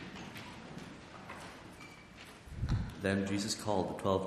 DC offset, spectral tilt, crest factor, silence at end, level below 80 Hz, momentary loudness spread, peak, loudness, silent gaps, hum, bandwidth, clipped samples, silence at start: under 0.1%; -5 dB/octave; 22 dB; 0 s; -50 dBFS; 17 LU; -16 dBFS; -38 LUFS; none; none; 14.5 kHz; under 0.1%; 0 s